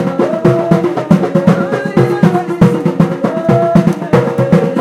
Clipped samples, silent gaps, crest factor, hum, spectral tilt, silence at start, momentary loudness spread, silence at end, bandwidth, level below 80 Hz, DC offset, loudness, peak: 0.3%; none; 10 dB; none; -8.5 dB/octave; 0 s; 3 LU; 0 s; 12.5 kHz; -42 dBFS; under 0.1%; -12 LUFS; 0 dBFS